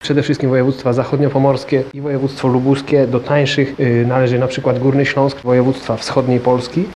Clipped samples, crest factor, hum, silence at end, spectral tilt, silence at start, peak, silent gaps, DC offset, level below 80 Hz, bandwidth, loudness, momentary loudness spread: under 0.1%; 14 dB; none; 0 s; -7 dB/octave; 0 s; 0 dBFS; none; under 0.1%; -48 dBFS; 11 kHz; -15 LUFS; 4 LU